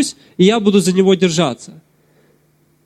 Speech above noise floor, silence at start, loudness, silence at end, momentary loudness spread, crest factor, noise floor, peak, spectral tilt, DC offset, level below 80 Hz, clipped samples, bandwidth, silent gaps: 42 dB; 0 s; -14 LUFS; 1.15 s; 8 LU; 14 dB; -57 dBFS; -2 dBFS; -5.5 dB/octave; under 0.1%; -58 dBFS; under 0.1%; 13.5 kHz; none